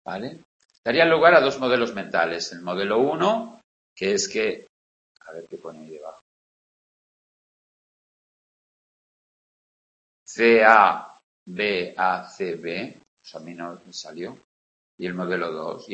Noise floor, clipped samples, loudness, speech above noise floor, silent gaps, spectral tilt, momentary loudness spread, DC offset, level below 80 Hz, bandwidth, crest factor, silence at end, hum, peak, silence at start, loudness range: under -90 dBFS; under 0.1%; -21 LUFS; over 68 dB; 0.45-0.60 s, 0.78-0.83 s, 3.64-3.96 s, 4.69-5.15 s, 6.21-10.26 s, 11.24-11.46 s, 13.08-13.17 s, 14.44-14.98 s; -4 dB/octave; 24 LU; under 0.1%; -66 dBFS; 8.6 kHz; 24 dB; 0 s; none; 0 dBFS; 0.05 s; 13 LU